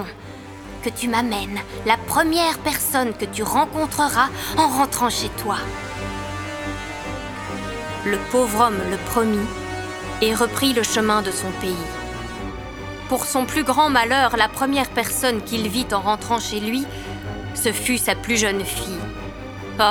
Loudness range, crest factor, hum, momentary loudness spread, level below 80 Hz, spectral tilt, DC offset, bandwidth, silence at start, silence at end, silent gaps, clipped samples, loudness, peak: 4 LU; 20 dB; none; 12 LU; -42 dBFS; -3 dB/octave; under 0.1%; over 20 kHz; 0 s; 0 s; none; under 0.1%; -21 LUFS; 0 dBFS